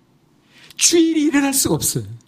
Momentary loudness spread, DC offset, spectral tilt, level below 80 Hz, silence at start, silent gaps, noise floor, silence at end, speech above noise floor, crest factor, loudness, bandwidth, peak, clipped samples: 7 LU; under 0.1%; -3 dB/octave; -50 dBFS; 0.8 s; none; -56 dBFS; 0.1 s; 39 dB; 18 dB; -16 LUFS; 15.5 kHz; 0 dBFS; under 0.1%